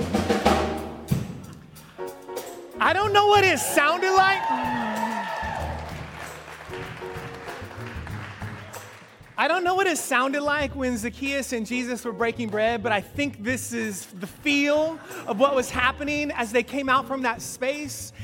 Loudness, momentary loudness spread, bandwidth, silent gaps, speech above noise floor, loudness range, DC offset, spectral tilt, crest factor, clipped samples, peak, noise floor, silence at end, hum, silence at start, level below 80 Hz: -24 LUFS; 17 LU; 17 kHz; none; 23 dB; 11 LU; under 0.1%; -4 dB/octave; 22 dB; under 0.1%; -4 dBFS; -47 dBFS; 0 s; none; 0 s; -48 dBFS